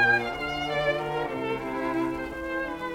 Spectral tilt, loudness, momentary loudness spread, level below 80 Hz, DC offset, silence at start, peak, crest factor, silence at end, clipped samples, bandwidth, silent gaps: -5.5 dB/octave; -28 LUFS; 6 LU; -50 dBFS; under 0.1%; 0 s; -12 dBFS; 16 dB; 0 s; under 0.1%; 16.5 kHz; none